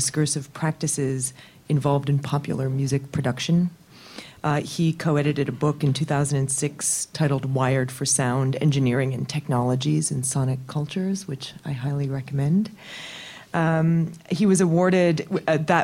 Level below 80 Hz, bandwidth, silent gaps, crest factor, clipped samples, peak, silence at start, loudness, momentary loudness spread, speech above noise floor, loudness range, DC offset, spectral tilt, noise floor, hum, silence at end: -56 dBFS; 15.5 kHz; none; 20 dB; under 0.1%; -4 dBFS; 0 s; -23 LUFS; 9 LU; 20 dB; 3 LU; under 0.1%; -5.5 dB/octave; -43 dBFS; none; 0 s